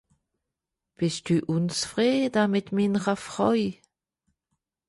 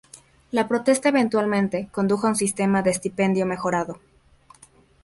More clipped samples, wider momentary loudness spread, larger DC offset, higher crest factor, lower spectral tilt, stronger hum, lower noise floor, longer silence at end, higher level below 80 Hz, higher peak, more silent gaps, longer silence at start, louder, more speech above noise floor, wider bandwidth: neither; about the same, 6 LU vs 6 LU; neither; about the same, 18 dB vs 16 dB; about the same, -5.5 dB/octave vs -5 dB/octave; neither; first, -86 dBFS vs -54 dBFS; about the same, 1.15 s vs 1.05 s; second, -64 dBFS vs -58 dBFS; second, -10 dBFS vs -6 dBFS; neither; first, 1 s vs 0.15 s; second, -26 LUFS vs -22 LUFS; first, 61 dB vs 32 dB; about the same, 11.5 kHz vs 11.5 kHz